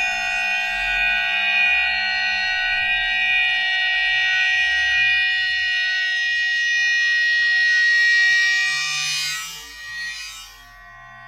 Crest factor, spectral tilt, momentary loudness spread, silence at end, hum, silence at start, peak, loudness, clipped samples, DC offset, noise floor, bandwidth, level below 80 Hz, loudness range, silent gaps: 12 dB; 1.5 dB/octave; 12 LU; 0 s; none; 0 s; -8 dBFS; -17 LUFS; under 0.1%; under 0.1%; -43 dBFS; 16 kHz; -50 dBFS; 2 LU; none